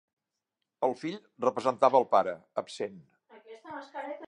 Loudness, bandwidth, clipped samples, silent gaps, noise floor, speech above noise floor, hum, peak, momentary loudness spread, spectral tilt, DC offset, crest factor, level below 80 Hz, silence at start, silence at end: -29 LUFS; 10.5 kHz; under 0.1%; none; -86 dBFS; 57 dB; none; -8 dBFS; 18 LU; -5.5 dB/octave; under 0.1%; 22 dB; -80 dBFS; 0.8 s; 0 s